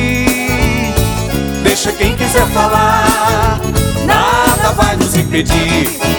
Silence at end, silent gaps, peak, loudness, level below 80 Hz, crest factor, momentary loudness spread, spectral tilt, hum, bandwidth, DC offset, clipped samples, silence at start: 0 s; none; 0 dBFS; -12 LUFS; -22 dBFS; 12 dB; 4 LU; -4.5 dB/octave; none; over 20 kHz; under 0.1%; under 0.1%; 0 s